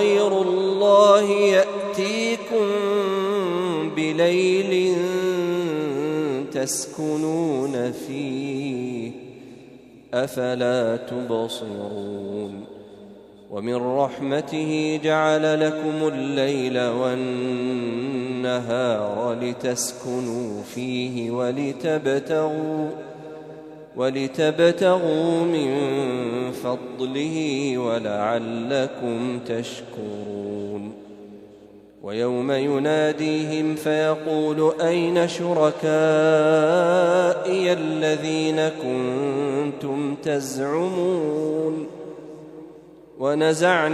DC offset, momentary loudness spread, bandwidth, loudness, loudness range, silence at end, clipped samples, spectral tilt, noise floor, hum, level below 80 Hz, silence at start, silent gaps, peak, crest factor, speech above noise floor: under 0.1%; 13 LU; 13.5 kHz; -22 LUFS; 8 LU; 0 s; under 0.1%; -5 dB/octave; -47 dBFS; none; -68 dBFS; 0 s; none; -2 dBFS; 20 dB; 25 dB